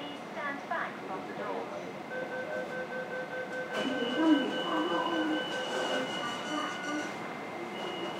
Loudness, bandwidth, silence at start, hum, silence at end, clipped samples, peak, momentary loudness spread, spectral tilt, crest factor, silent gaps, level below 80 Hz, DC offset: -34 LUFS; 15.5 kHz; 0 s; none; 0 s; under 0.1%; -14 dBFS; 10 LU; -4 dB/octave; 20 dB; none; -78 dBFS; under 0.1%